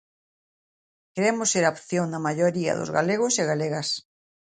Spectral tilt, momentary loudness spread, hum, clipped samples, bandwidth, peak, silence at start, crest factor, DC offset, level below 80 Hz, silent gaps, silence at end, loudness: -4 dB/octave; 6 LU; none; under 0.1%; 9.6 kHz; -6 dBFS; 1.15 s; 20 dB; under 0.1%; -68 dBFS; none; 0.6 s; -24 LUFS